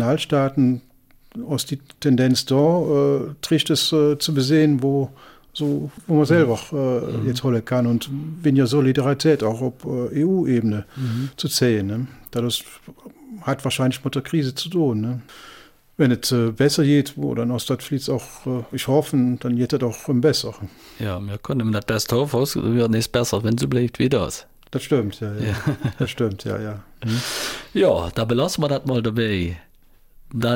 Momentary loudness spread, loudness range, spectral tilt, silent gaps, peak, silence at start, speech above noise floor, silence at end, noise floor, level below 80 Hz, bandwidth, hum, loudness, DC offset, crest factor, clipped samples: 11 LU; 5 LU; -6 dB/octave; none; -6 dBFS; 0 s; 30 dB; 0 s; -51 dBFS; -50 dBFS; 17 kHz; none; -21 LUFS; under 0.1%; 16 dB; under 0.1%